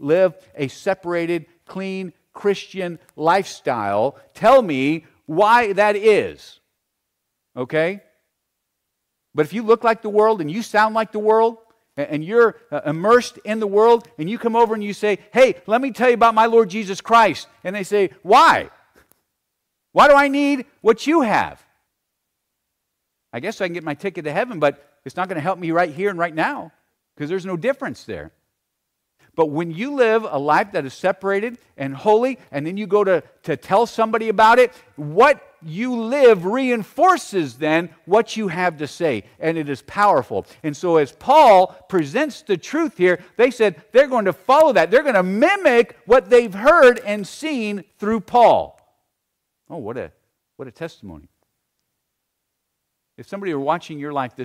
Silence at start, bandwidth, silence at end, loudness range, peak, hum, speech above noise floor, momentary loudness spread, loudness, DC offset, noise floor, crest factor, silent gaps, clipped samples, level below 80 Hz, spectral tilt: 0 s; 15 kHz; 0 s; 10 LU; -4 dBFS; none; 59 dB; 15 LU; -18 LUFS; under 0.1%; -77 dBFS; 16 dB; none; under 0.1%; -56 dBFS; -5.5 dB/octave